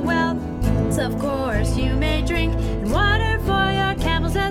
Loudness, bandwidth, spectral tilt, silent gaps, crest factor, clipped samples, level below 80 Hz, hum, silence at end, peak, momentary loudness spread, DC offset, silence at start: -21 LUFS; 15.5 kHz; -6 dB/octave; none; 14 dB; under 0.1%; -26 dBFS; none; 0 s; -6 dBFS; 4 LU; under 0.1%; 0 s